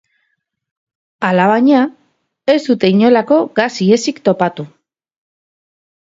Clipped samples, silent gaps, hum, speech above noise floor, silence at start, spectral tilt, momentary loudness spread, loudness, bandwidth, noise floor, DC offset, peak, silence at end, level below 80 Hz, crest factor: under 0.1%; none; none; 56 dB; 1.2 s; -6 dB/octave; 10 LU; -13 LUFS; 7.8 kHz; -68 dBFS; under 0.1%; 0 dBFS; 1.35 s; -62 dBFS; 14 dB